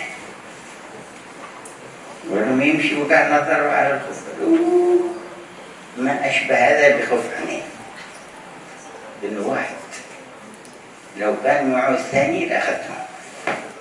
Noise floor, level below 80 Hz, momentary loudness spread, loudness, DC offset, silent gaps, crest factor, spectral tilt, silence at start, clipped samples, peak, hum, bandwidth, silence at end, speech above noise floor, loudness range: -41 dBFS; -66 dBFS; 22 LU; -19 LUFS; under 0.1%; none; 20 dB; -4.5 dB/octave; 0 s; under 0.1%; 0 dBFS; none; 12 kHz; 0 s; 23 dB; 11 LU